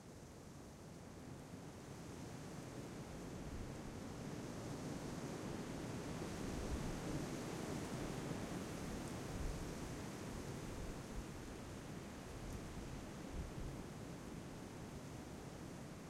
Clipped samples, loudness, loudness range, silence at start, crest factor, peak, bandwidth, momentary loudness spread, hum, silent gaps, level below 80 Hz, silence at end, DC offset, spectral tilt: under 0.1%; -49 LUFS; 5 LU; 0 s; 16 dB; -32 dBFS; 16 kHz; 8 LU; none; none; -56 dBFS; 0 s; under 0.1%; -5.5 dB/octave